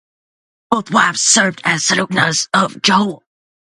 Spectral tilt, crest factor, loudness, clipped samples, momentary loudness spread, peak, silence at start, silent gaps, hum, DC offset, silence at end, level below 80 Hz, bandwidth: -2 dB/octave; 16 dB; -14 LUFS; under 0.1%; 6 LU; 0 dBFS; 0.7 s; none; none; under 0.1%; 0.65 s; -58 dBFS; 11.5 kHz